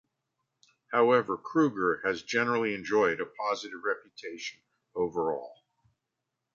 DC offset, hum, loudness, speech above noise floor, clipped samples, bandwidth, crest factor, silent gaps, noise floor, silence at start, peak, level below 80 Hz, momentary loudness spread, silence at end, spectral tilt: under 0.1%; none; -29 LUFS; 56 dB; under 0.1%; 7.4 kHz; 20 dB; none; -85 dBFS; 0.9 s; -10 dBFS; -70 dBFS; 14 LU; 1 s; -5 dB/octave